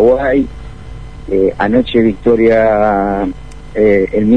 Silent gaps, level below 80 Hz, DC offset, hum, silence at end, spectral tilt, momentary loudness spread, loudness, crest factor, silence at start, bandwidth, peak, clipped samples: none; -32 dBFS; 2%; none; 0 s; -8 dB/octave; 21 LU; -12 LUFS; 12 dB; 0 s; 9.6 kHz; 0 dBFS; under 0.1%